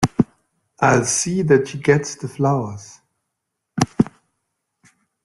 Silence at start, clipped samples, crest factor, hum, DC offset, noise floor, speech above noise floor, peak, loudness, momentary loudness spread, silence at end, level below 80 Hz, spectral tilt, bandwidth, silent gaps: 0 s; under 0.1%; 20 dB; none; under 0.1%; -78 dBFS; 60 dB; 0 dBFS; -19 LUFS; 11 LU; 1.15 s; -52 dBFS; -5 dB/octave; 12 kHz; none